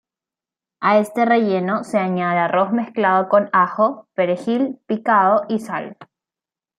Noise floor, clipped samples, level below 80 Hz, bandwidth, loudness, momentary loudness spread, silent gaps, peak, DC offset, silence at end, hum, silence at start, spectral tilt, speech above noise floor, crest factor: -90 dBFS; under 0.1%; -72 dBFS; 13 kHz; -18 LUFS; 8 LU; none; -2 dBFS; under 0.1%; 0.75 s; none; 0.8 s; -7 dB/octave; 72 dB; 16 dB